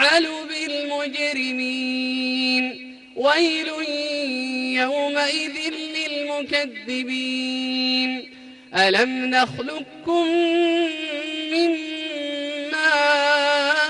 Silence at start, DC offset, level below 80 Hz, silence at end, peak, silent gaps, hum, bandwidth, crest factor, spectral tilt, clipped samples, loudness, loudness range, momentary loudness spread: 0 s; under 0.1%; -68 dBFS; 0 s; -6 dBFS; none; none; 11.5 kHz; 16 dB; -2.5 dB/octave; under 0.1%; -21 LUFS; 3 LU; 9 LU